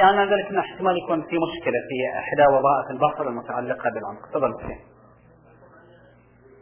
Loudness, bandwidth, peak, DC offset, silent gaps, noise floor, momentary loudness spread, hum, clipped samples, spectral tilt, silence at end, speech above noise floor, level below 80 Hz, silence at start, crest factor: -23 LUFS; 3.5 kHz; -6 dBFS; under 0.1%; none; -53 dBFS; 12 LU; none; under 0.1%; -9 dB/octave; 1.8 s; 31 dB; -56 dBFS; 0 s; 18 dB